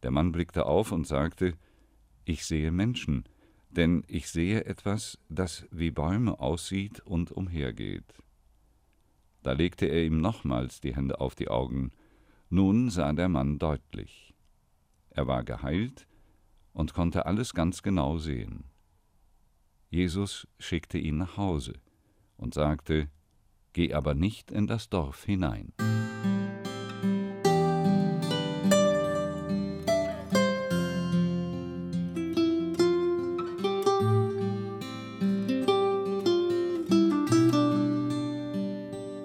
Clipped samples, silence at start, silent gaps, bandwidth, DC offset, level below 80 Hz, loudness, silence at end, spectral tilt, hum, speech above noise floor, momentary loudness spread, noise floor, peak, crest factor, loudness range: under 0.1%; 0 s; none; 16 kHz; under 0.1%; -44 dBFS; -29 LUFS; 0 s; -6.5 dB/octave; none; 37 dB; 11 LU; -67 dBFS; -12 dBFS; 16 dB; 7 LU